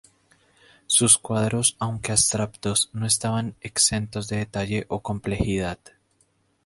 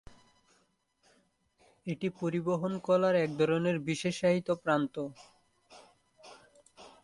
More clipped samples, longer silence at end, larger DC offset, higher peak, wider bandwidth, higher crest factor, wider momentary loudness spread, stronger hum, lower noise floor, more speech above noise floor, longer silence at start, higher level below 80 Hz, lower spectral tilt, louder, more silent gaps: neither; first, 0.9 s vs 0.15 s; neither; first, -2 dBFS vs -14 dBFS; about the same, 12 kHz vs 11.5 kHz; about the same, 24 dB vs 20 dB; about the same, 11 LU vs 11 LU; neither; second, -66 dBFS vs -73 dBFS; about the same, 42 dB vs 43 dB; second, 0.9 s vs 1.85 s; first, -46 dBFS vs -70 dBFS; second, -3 dB/octave vs -6.5 dB/octave; first, -22 LUFS vs -31 LUFS; neither